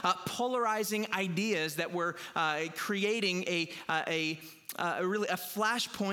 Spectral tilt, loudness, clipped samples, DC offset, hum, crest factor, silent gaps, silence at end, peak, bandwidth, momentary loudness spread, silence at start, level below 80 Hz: -3.5 dB/octave; -32 LUFS; under 0.1%; under 0.1%; none; 18 dB; none; 0 s; -14 dBFS; 19.5 kHz; 4 LU; 0 s; -78 dBFS